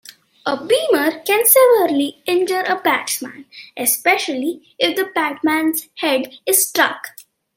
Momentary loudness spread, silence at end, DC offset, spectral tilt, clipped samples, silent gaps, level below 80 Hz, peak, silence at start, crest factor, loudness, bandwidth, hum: 12 LU; 0.35 s; under 0.1%; -1 dB/octave; under 0.1%; none; -70 dBFS; 0 dBFS; 0.45 s; 18 dB; -17 LUFS; 16.5 kHz; none